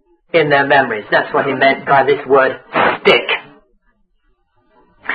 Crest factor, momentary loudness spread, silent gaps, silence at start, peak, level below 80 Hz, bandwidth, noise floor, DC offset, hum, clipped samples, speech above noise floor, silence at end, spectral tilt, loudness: 16 dB; 6 LU; none; 0.35 s; 0 dBFS; -54 dBFS; 6.2 kHz; -60 dBFS; under 0.1%; none; under 0.1%; 47 dB; 0 s; -6.5 dB/octave; -13 LUFS